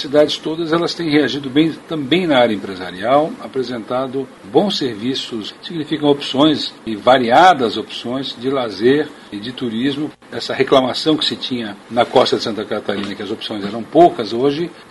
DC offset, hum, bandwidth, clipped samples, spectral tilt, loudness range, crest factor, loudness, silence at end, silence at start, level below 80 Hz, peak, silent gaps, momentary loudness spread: under 0.1%; none; 11.5 kHz; under 0.1%; -5.5 dB/octave; 4 LU; 16 dB; -17 LUFS; 0.1 s; 0 s; -56 dBFS; 0 dBFS; none; 12 LU